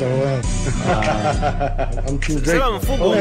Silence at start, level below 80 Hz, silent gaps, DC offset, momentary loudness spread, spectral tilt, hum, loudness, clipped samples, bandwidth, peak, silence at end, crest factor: 0 s; -24 dBFS; none; under 0.1%; 5 LU; -5.5 dB/octave; none; -20 LUFS; under 0.1%; 16 kHz; -6 dBFS; 0 s; 12 dB